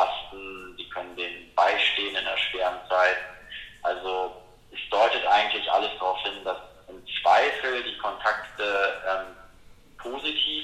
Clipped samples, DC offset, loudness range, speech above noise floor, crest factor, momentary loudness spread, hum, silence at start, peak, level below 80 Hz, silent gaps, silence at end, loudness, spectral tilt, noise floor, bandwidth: under 0.1%; under 0.1%; 2 LU; 24 dB; 18 dB; 17 LU; none; 0 s; -8 dBFS; -58 dBFS; none; 0 s; -25 LUFS; -2 dB/octave; -51 dBFS; 13.5 kHz